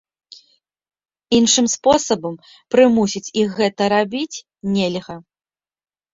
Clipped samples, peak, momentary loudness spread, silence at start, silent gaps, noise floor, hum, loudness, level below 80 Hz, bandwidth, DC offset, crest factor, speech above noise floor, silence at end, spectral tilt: under 0.1%; -2 dBFS; 15 LU; 1.3 s; none; under -90 dBFS; none; -18 LUFS; -54 dBFS; 7.8 kHz; under 0.1%; 18 dB; over 73 dB; 0.95 s; -3.5 dB/octave